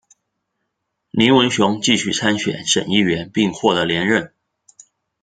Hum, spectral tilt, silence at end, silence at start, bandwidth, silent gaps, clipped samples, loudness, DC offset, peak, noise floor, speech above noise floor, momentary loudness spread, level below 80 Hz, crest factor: none; -4 dB/octave; 0.95 s; 1.15 s; 9.4 kHz; none; under 0.1%; -17 LUFS; under 0.1%; 0 dBFS; -75 dBFS; 58 dB; 7 LU; -56 dBFS; 18 dB